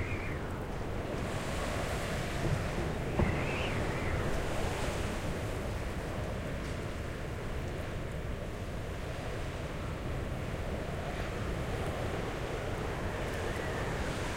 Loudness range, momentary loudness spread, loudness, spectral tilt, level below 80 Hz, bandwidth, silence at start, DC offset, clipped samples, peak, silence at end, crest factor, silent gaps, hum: 5 LU; 5 LU; -36 LUFS; -5.5 dB/octave; -42 dBFS; 16 kHz; 0 s; under 0.1%; under 0.1%; -18 dBFS; 0 s; 18 dB; none; none